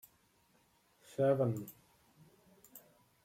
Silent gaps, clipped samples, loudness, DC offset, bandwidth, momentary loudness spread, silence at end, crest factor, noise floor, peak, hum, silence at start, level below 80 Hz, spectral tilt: none; under 0.1%; -35 LUFS; under 0.1%; 16.5 kHz; 26 LU; 0.45 s; 20 dB; -72 dBFS; -20 dBFS; none; 1.2 s; -80 dBFS; -8 dB/octave